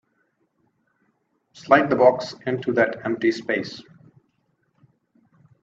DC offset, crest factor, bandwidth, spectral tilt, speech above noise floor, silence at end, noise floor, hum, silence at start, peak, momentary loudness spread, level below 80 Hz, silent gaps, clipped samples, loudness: under 0.1%; 22 dB; 7.8 kHz; -6 dB/octave; 49 dB; 1.8 s; -70 dBFS; none; 1.55 s; -2 dBFS; 15 LU; -68 dBFS; none; under 0.1%; -21 LUFS